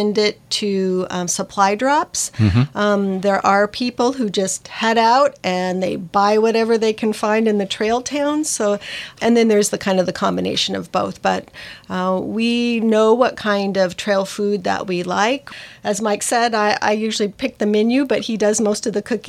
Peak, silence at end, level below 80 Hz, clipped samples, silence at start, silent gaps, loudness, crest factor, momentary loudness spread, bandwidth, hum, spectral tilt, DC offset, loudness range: -2 dBFS; 0 s; -50 dBFS; under 0.1%; 0 s; none; -18 LUFS; 16 dB; 7 LU; 15 kHz; none; -4.5 dB/octave; under 0.1%; 2 LU